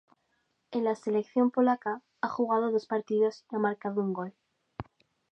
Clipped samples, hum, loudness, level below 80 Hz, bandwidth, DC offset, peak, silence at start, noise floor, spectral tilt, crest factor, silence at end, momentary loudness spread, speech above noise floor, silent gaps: under 0.1%; none; -30 LUFS; -68 dBFS; 8.4 kHz; under 0.1%; -14 dBFS; 0.7 s; -76 dBFS; -7.5 dB/octave; 16 dB; 0.5 s; 18 LU; 47 dB; none